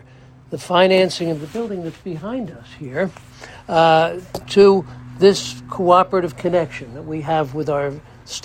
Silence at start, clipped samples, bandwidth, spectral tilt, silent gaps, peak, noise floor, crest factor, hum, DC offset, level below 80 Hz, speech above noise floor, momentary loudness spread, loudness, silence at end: 0.5 s; under 0.1%; 14.5 kHz; -5.5 dB/octave; none; 0 dBFS; -45 dBFS; 18 dB; none; under 0.1%; -50 dBFS; 27 dB; 18 LU; -18 LUFS; 0.05 s